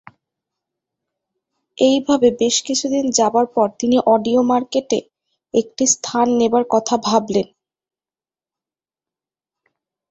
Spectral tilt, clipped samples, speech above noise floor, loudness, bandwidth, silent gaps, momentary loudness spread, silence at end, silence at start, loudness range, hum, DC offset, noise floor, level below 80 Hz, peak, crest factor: -3.5 dB/octave; under 0.1%; over 74 dB; -17 LUFS; 8.2 kHz; none; 7 LU; 2.65 s; 1.8 s; 5 LU; none; under 0.1%; under -90 dBFS; -60 dBFS; 0 dBFS; 18 dB